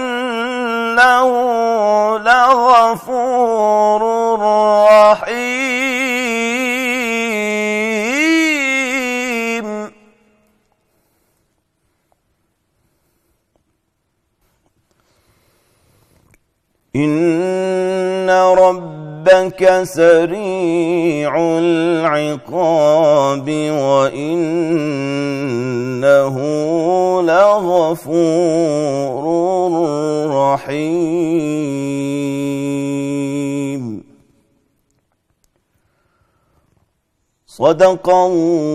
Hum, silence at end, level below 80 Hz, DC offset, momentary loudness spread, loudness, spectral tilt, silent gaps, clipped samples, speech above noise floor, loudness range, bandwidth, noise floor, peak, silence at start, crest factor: none; 0 s; -56 dBFS; under 0.1%; 9 LU; -14 LUFS; -5 dB/octave; none; under 0.1%; 53 dB; 10 LU; 14.5 kHz; -67 dBFS; -2 dBFS; 0 s; 14 dB